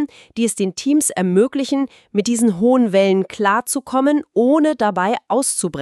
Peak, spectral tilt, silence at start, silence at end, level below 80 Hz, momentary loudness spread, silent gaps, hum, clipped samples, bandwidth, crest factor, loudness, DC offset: -2 dBFS; -4.5 dB/octave; 0 s; 0 s; -60 dBFS; 6 LU; none; none; under 0.1%; 13.5 kHz; 14 dB; -17 LUFS; under 0.1%